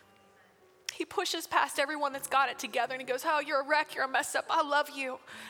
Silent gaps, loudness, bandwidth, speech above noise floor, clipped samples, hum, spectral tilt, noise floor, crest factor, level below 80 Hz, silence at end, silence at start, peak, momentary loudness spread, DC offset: none; -31 LUFS; over 20 kHz; 31 dB; under 0.1%; none; -1 dB/octave; -62 dBFS; 20 dB; -78 dBFS; 0 s; 0.9 s; -12 dBFS; 8 LU; under 0.1%